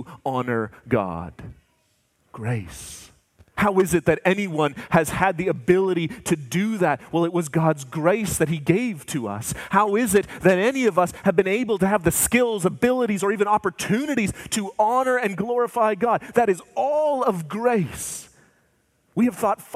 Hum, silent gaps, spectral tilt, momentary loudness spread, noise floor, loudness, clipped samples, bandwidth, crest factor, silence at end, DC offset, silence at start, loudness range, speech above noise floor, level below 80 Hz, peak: none; none; -5 dB/octave; 9 LU; -66 dBFS; -22 LUFS; under 0.1%; 16 kHz; 20 dB; 0 s; under 0.1%; 0 s; 4 LU; 45 dB; -50 dBFS; -2 dBFS